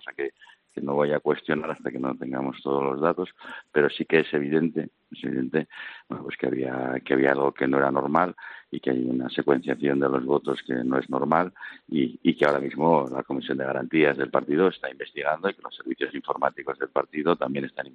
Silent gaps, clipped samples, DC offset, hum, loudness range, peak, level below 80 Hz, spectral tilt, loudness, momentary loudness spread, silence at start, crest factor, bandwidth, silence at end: none; under 0.1%; under 0.1%; none; 3 LU; -6 dBFS; -70 dBFS; -8 dB/octave; -26 LUFS; 12 LU; 0.05 s; 20 dB; 7.6 kHz; 0.05 s